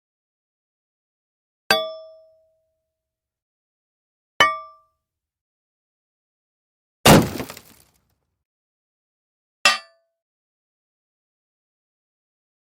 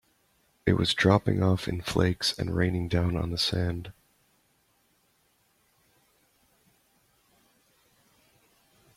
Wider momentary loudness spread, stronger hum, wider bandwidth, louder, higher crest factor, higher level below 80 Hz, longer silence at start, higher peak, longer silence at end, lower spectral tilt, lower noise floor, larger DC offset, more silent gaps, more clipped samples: first, 19 LU vs 9 LU; neither; first, 16.5 kHz vs 14.5 kHz; first, -18 LUFS vs -27 LUFS; about the same, 26 dB vs 22 dB; about the same, -48 dBFS vs -52 dBFS; first, 1.7 s vs 0.65 s; first, 0 dBFS vs -8 dBFS; second, 2.8 s vs 5.05 s; second, -3.5 dB/octave vs -5.5 dB/octave; first, -86 dBFS vs -69 dBFS; neither; first, 3.42-4.40 s, 5.41-7.04 s, 8.45-9.65 s vs none; neither